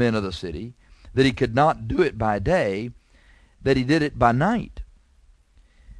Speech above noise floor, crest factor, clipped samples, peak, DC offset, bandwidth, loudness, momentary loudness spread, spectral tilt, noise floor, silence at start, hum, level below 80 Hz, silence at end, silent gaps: 35 dB; 20 dB; under 0.1%; -4 dBFS; under 0.1%; 10.5 kHz; -22 LUFS; 16 LU; -7 dB/octave; -56 dBFS; 0 s; none; -42 dBFS; 0 s; none